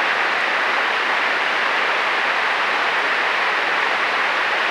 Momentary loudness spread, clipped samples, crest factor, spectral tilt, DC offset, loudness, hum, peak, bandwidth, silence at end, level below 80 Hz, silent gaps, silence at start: 0 LU; under 0.1%; 16 dB; -1 dB/octave; under 0.1%; -18 LUFS; none; -4 dBFS; 16.5 kHz; 0 s; -70 dBFS; none; 0 s